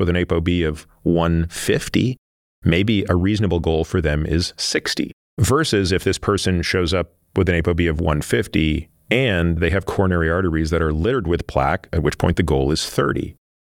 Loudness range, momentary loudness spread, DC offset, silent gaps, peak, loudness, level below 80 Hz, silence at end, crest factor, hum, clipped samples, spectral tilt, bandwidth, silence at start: 1 LU; 4 LU; under 0.1%; 2.18-2.62 s, 5.13-5.37 s; 0 dBFS; -20 LUFS; -32 dBFS; 0.4 s; 18 dB; none; under 0.1%; -5.5 dB/octave; 16 kHz; 0 s